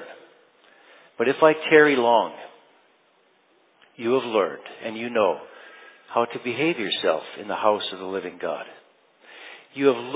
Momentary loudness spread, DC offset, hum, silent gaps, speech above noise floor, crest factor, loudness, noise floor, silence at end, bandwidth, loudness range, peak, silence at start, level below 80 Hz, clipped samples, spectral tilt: 25 LU; under 0.1%; none; none; 40 dB; 22 dB; -23 LUFS; -62 dBFS; 0 s; 4 kHz; 6 LU; -2 dBFS; 0 s; -76 dBFS; under 0.1%; -8.5 dB/octave